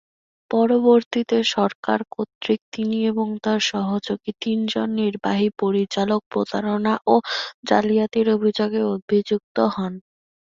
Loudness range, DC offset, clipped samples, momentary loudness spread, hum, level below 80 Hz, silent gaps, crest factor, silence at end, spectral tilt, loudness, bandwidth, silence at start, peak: 2 LU; under 0.1%; under 0.1%; 7 LU; none; -64 dBFS; 1.06-1.11 s, 1.75-1.83 s, 2.35-2.41 s, 2.62-2.72 s, 6.26-6.31 s, 7.54-7.63 s, 9.02-9.08 s, 9.44-9.55 s; 20 dB; 0.5 s; -5.5 dB/octave; -21 LUFS; 7.6 kHz; 0.5 s; -2 dBFS